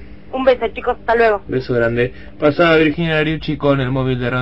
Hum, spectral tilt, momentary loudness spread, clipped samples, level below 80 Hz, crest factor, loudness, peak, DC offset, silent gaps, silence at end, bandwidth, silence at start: none; -8.5 dB/octave; 8 LU; under 0.1%; -38 dBFS; 14 dB; -16 LUFS; -2 dBFS; 1%; none; 0 s; 8 kHz; 0 s